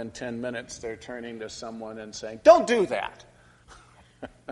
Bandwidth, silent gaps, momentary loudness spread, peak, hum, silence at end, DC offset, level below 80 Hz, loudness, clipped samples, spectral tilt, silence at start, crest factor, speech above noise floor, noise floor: 11.5 kHz; none; 21 LU; -2 dBFS; 60 Hz at -55 dBFS; 0 s; under 0.1%; -60 dBFS; -23 LUFS; under 0.1%; -4 dB/octave; 0 s; 26 dB; 28 dB; -54 dBFS